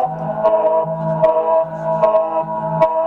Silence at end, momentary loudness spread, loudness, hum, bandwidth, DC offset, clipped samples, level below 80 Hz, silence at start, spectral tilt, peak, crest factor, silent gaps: 0 s; 6 LU; -17 LUFS; none; 4.4 kHz; under 0.1%; under 0.1%; -52 dBFS; 0 s; -9 dB/octave; -4 dBFS; 12 dB; none